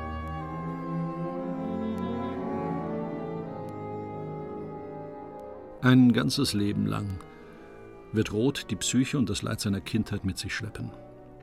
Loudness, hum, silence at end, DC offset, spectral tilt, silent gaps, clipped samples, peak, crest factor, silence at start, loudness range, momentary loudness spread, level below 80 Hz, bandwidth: -29 LUFS; none; 0 s; under 0.1%; -5.5 dB/octave; none; under 0.1%; -8 dBFS; 22 dB; 0 s; 8 LU; 16 LU; -52 dBFS; 15 kHz